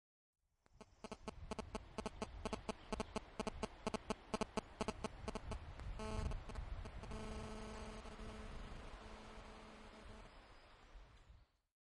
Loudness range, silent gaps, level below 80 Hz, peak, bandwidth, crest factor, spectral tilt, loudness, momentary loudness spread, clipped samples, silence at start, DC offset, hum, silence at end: 9 LU; none; -54 dBFS; -26 dBFS; 11.5 kHz; 24 dB; -5 dB/octave; -50 LUFS; 17 LU; under 0.1%; 0.75 s; under 0.1%; none; 0.45 s